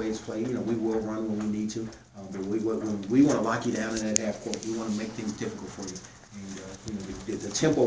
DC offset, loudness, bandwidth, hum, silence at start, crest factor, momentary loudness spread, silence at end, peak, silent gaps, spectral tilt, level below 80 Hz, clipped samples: under 0.1%; -30 LUFS; 8 kHz; none; 0 s; 26 dB; 15 LU; 0 s; -2 dBFS; none; -5 dB/octave; -56 dBFS; under 0.1%